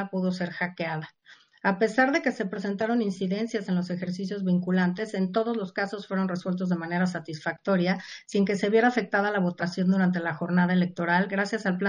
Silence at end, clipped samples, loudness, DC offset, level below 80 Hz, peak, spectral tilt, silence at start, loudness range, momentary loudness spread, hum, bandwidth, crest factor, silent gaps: 0 s; under 0.1%; -27 LUFS; under 0.1%; -74 dBFS; -8 dBFS; -7 dB/octave; 0 s; 3 LU; 8 LU; none; 9.8 kHz; 18 dB; none